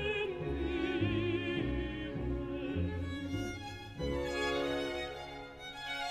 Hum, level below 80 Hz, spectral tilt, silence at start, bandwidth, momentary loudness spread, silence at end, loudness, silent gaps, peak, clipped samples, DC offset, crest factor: none; -48 dBFS; -6 dB/octave; 0 s; 14.5 kHz; 10 LU; 0 s; -37 LUFS; none; -20 dBFS; under 0.1%; under 0.1%; 16 dB